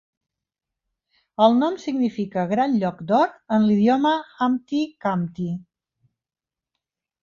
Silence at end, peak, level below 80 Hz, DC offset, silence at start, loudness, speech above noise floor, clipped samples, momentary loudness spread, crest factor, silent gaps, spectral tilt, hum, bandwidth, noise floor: 1.6 s; -4 dBFS; -66 dBFS; under 0.1%; 1.4 s; -22 LUFS; 69 dB; under 0.1%; 9 LU; 18 dB; none; -7.5 dB/octave; none; 7.2 kHz; -90 dBFS